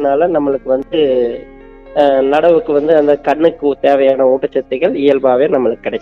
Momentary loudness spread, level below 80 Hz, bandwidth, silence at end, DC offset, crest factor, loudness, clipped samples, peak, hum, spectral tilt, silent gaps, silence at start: 5 LU; -46 dBFS; 6 kHz; 0 s; under 0.1%; 12 dB; -13 LUFS; under 0.1%; 0 dBFS; none; -7.5 dB/octave; none; 0 s